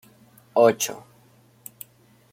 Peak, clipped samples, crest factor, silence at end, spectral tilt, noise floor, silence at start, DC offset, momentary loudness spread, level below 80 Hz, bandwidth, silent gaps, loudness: -4 dBFS; under 0.1%; 22 dB; 1.35 s; -3.5 dB/octave; -57 dBFS; 0.55 s; under 0.1%; 25 LU; -72 dBFS; 16.5 kHz; none; -21 LUFS